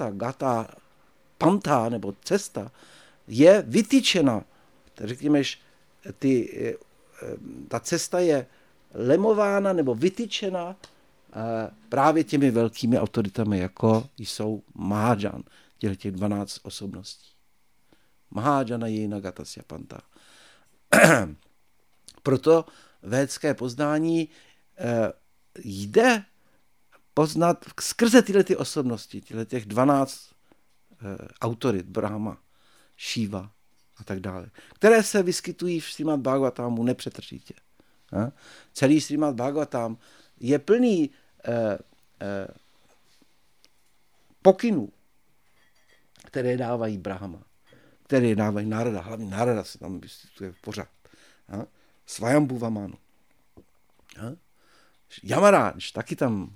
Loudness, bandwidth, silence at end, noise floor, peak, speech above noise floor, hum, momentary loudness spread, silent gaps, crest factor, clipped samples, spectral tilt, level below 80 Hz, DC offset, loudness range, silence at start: -24 LUFS; 17.5 kHz; 0 s; -69 dBFS; 0 dBFS; 45 dB; none; 20 LU; none; 26 dB; under 0.1%; -5.5 dB/octave; -62 dBFS; under 0.1%; 8 LU; 0 s